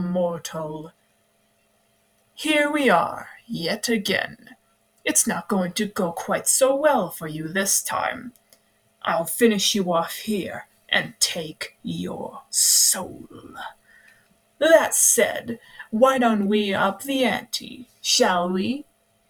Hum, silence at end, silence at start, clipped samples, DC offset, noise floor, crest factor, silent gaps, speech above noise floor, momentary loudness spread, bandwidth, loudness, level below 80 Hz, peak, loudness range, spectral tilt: none; 0.45 s; 0 s; under 0.1%; under 0.1%; -65 dBFS; 20 dB; none; 42 dB; 18 LU; over 20 kHz; -21 LUFS; -64 dBFS; -2 dBFS; 5 LU; -2.5 dB/octave